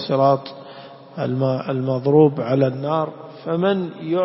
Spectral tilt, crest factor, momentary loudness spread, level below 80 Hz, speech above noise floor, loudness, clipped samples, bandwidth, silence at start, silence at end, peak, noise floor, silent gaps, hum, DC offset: -12 dB/octave; 16 dB; 21 LU; -62 dBFS; 21 dB; -20 LUFS; under 0.1%; 5.8 kHz; 0 s; 0 s; -4 dBFS; -40 dBFS; none; none; under 0.1%